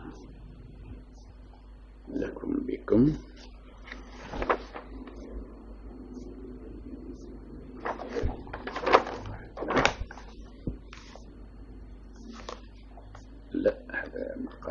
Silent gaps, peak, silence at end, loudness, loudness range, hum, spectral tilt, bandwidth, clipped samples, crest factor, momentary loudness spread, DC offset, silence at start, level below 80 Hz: none; 0 dBFS; 0 s; -31 LUFS; 12 LU; none; -6 dB/octave; 7.4 kHz; under 0.1%; 32 dB; 23 LU; under 0.1%; 0 s; -44 dBFS